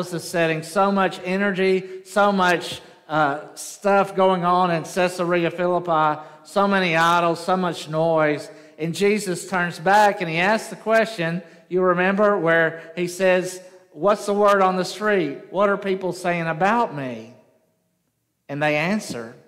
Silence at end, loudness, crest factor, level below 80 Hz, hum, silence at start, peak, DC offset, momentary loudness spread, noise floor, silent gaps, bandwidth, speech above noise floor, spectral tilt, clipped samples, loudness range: 0.15 s; -21 LUFS; 16 dB; -66 dBFS; none; 0 s; -4 dBFS; under 0.1%; 11 LU; -72 dBFS; none; 16 kHz; 51 dB; -5 dB/octave; under 0.1%; 3 LU